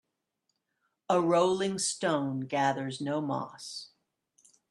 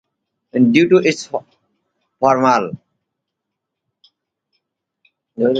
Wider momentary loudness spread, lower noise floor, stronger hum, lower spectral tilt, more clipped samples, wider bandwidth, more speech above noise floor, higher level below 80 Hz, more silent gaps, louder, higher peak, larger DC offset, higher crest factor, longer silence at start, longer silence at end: about the same, 14 LU vs 16 LU; about the same, -81 dBFS vs -79 dBFS; neither; about the same, -4.5 dB/octave vs -5.5 dB/octave; neither; first, 12.5 kHz vs 8.8 kHz; second, 52 dB vs 65 dB; second, -76 dBFS vs -62 dBFS; neither; second, -30 LUFS vs -16 LUFS; second, -12 dBFS vs 0 dBFS; neither; about the same, 20 dB vs 20 dB; first, 1.1 s vs 0.55 s; first, 0.85 s vs 0 s